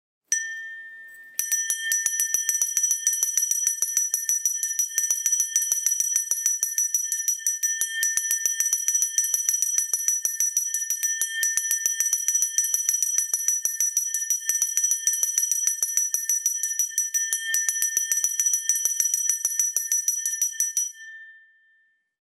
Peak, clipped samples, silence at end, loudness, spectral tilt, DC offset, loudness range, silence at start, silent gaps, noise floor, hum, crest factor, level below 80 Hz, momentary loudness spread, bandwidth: -6 dBFS; under 0.1%; 0.9 s; -22 LUFS; 6.5 dB/octave; under 0.1%; 1 LU; 0.3 s; none; -65 dBFS; none; 20 dB; under -90 dBFS; 3 LU; 16 kHz